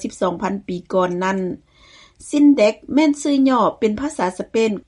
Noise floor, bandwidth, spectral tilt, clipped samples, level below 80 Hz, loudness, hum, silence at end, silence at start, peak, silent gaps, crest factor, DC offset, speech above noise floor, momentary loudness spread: -49 dBFS; 11 kHz; -5.5 dB/octave; under 0.1%; -54 dBFS; -18 LUFS; none; 0.05 s; 0 s; -2 dBFS; none; 16 dB; under 0.1%; 31 dB; 10 LU